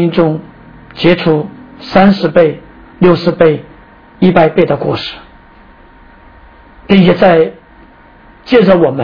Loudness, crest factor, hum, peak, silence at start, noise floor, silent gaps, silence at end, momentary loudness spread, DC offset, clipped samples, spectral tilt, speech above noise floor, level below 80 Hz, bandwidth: -10 LUFS; 12 dB; none; 0 dBFS; 0 s; -40 dBFS; none; 0 s; 15 LU; under 0.1%; 0.6%; -9 dB/octave; 31 dB; -40 dBFS; 5.4 kHz